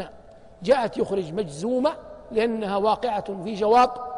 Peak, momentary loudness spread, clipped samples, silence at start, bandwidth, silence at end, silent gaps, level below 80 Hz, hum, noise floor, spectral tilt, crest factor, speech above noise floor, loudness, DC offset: -8 dBFS; 12 LU; under 0.1%; 0 s; 10.5 kHz; 0 s; none; -54 dBFS; none; -47 dBFS; -5.5 dB/octave; 16 dB; 24 dB; -24 LUFS; under 0.1%